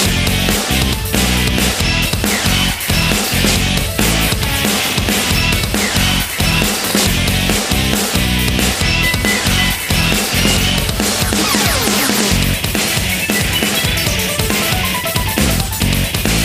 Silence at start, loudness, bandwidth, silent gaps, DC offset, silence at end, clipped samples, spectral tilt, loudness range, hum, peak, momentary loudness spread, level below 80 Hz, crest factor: 0 s; -14 LUFS; 16 kHz; none; under 0.1%; 0 s; under 0.1%; -3 dB/octave; 1 LU; none; 0 dBFS; 2 LU; -24 dBFS; 14 dB